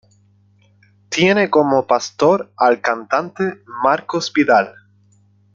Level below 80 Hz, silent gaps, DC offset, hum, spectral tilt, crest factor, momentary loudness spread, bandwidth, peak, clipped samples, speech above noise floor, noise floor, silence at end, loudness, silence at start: -62 dBFS; none; under 0.1%; 50 Hz at -45 dBFS; -4.5 dB/octave; 16 dB; 9 LU; 7.6 kHz; -2 dBFS; under 0.1%; 38 dB; -54 dBFS; 0.85 s; -17 LUFS; 1.1 s